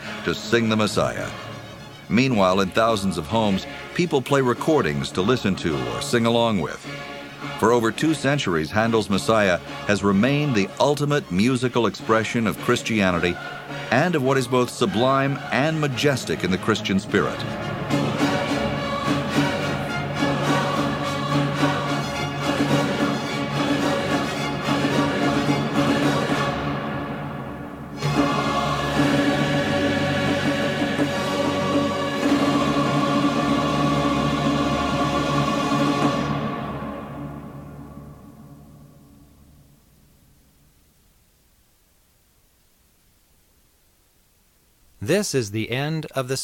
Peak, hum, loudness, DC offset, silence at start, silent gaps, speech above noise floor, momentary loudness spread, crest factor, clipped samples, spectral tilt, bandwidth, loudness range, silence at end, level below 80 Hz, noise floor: -4 dBFS; none; -22 LUFS; under 0.1%; 0 s; none; 39 dB; 10 LU; 20 dB; under 0.1%; -5.5 dB/octave; 16.5 kHz; 3 LU; 0 s; -48 dBFS; -60 dBFS